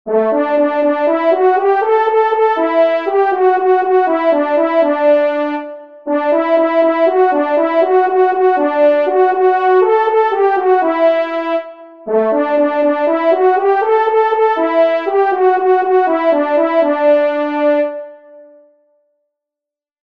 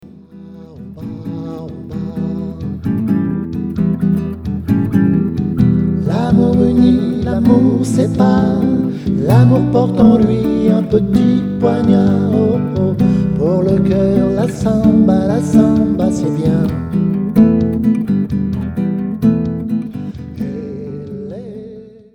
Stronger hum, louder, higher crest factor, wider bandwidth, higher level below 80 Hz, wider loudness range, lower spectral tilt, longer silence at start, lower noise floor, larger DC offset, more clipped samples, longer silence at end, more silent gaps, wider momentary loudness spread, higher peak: neither; about the same, -13 LUFS vs -14 LUFS; about the same, 12 dB vs 12 dB; second, 5.6 kHz vs 11.5 kHz; second, -68 dBFS vs -34 dBFS; second, 2 LU vs 7 LU; second, -6 dB/octave vs -9 dB/octave; about the same, 0.05 s vs 0.05 s; first, -86 dBFS vs -36 dBFS; first, 0.3% vs under 0.1%; neither; first, 1.65 s vs 0.25 s; neither; second, 4 LU vs 15 LU; about the same, -2 dBFS vs 0 dBFS